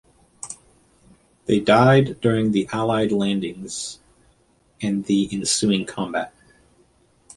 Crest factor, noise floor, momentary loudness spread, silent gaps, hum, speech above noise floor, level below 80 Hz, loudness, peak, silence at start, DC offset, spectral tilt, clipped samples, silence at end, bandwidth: 20 dB; -60 dBFS; 19 LU; none; none; 40 dB; -54 dBFS; -21 LUFS; -2 dBFS; 0.45 s; under 0.1%; -5 dB/octave; under 0.1%; 1.1 s; 11.5 kHz